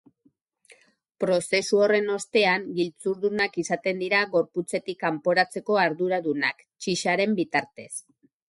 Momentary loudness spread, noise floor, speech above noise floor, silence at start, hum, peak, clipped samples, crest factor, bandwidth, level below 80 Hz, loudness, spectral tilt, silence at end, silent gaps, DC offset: 8 LU; -67 dBFS; 42 dB; 1.2 s; none; -8 dBFS; under 0.1%; 18 dB; 11.5 kHz; -72 dBFS; -25 LUFS; -4 dB/octave; 0.5 s; none; under 0.1%